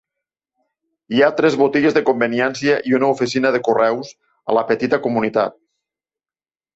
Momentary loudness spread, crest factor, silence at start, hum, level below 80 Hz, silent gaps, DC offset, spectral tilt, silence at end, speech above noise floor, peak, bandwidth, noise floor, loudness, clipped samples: 7 LU; 16 dB; 1.1 s; none; -62 dBFS; none; under 0.1%; -5.5 dB/octave; 1.25 s; over 73 dB; -2 dBFS; 8 kHz; under -90 dBFS; -17 LUFS; under 0.1%